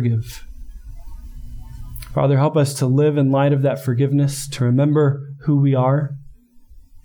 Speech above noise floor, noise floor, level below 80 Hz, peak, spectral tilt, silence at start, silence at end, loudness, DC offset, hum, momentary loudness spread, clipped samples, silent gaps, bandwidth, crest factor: 28 dB; -44 dBFS; -40 dBFS; -6 dBFS; -7.5 dB/octave; 0 s; 0.05 s; -18 LUFS; under 0.1%; none; 21 LU; under 0.1%; none; 19.5 kHz; 12 dB